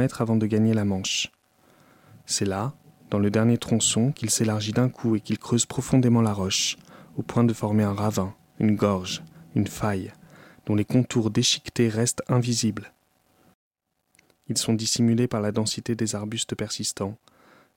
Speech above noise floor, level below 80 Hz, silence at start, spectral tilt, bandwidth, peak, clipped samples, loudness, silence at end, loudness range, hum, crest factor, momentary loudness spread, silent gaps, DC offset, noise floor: 42 dB; -58 dBFS; 0 s; -4.5 dB/octave; 17 kHz; -8 dBFS; under 0.1%; -24 LUFS; 0.6 s; 4 LU; none; 18 dB; 9 LU; 13.54-13.71 s; under 0.1%; -66 dBFS